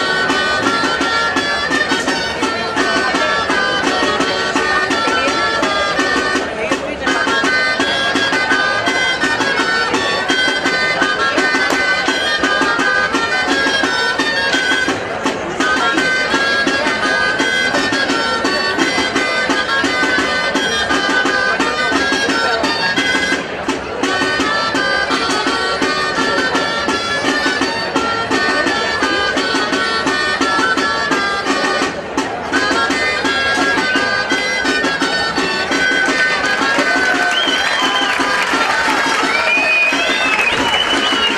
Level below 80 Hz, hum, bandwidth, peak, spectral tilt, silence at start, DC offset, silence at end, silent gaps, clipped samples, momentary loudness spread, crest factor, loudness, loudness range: -44 dBFS; none; 15 kHz; 0 dBFS; -2.5 dB/octave; 0 s; under 0.1%; 0 s; none; under 0.1%; 3 LU; 16 dB; -14 LUFS; 2 LU